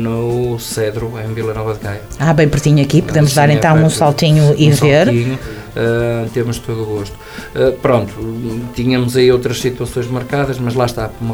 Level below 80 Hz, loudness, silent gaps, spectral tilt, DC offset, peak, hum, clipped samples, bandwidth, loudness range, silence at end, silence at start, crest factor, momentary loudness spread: -36 dBFS; -14 LUFS; none; -6 dB/octave; under 0.1%; 0 dBFS; none; under 0.1%; 16.5 kHz; 6 LU; 0 s; 0 s; 14 dB; 12 LU